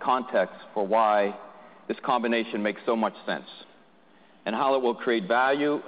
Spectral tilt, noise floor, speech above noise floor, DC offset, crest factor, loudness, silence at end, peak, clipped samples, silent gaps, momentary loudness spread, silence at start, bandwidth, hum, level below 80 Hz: -9 dB/octave; -58 dBFS; 32 dB; under 0.1%; 16 dB; -26 LUFS; 0 s; -10 dBFS; under 0.1%; none; 12 LU; 0 s; 5 kHz; none; -76 dBFS